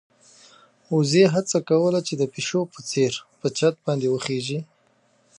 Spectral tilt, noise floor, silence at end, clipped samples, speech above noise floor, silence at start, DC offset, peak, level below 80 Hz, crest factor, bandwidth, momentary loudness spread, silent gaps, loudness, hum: -5 dB/octave; -63 dBFS; 0.75 s; under 0.1%; 41 dB; 0.9 s; under 0.1%; -4 dBFS; -70 dBFS; 18 dB; 11 kHz; 10 LU; none; -23 LUFS; none